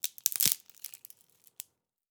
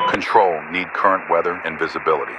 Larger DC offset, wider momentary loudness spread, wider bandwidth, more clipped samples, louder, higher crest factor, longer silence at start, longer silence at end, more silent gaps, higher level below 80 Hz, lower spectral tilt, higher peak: neither; first, 21 LU vs 7 LU; first, over 20 kHz vs 11 kHz; neither; second, -28 LUFS vs -19 LUFS; first, 36 dB vs 20 dB; about the same, 0.05 s vs 0 s; first, 1.25 s vs 0 s; neither; second, -86 dBFS vs -58 dBFS; second, 1 dB/octave vs -5 dB/octave; about the same, 0 dBFS vs 0 dBFS